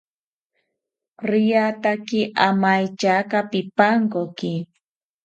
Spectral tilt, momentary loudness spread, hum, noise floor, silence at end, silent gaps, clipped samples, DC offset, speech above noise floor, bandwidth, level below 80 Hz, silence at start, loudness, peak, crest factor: -6 dB/octave; 10 LU; none; -90 dBFS; 0.6 s; none; under 0.1%; under 0.1%; 70 dB; 8 kHz; -70 dBFS; 1.2 s; -20 LUFS; 0 dBFS; 22 dB